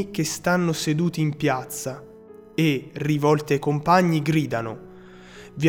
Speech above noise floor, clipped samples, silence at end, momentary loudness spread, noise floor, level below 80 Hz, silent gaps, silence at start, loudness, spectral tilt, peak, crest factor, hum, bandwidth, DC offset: 23 dB; under 0.1%; 0 s; 15 LU; -45 dBFS; -56 dBFS; none; 0 s; -23 LUFS; -5.5 dB/octave; -4 dBFS; 18 dB; none; 18 kHz; under 0.1%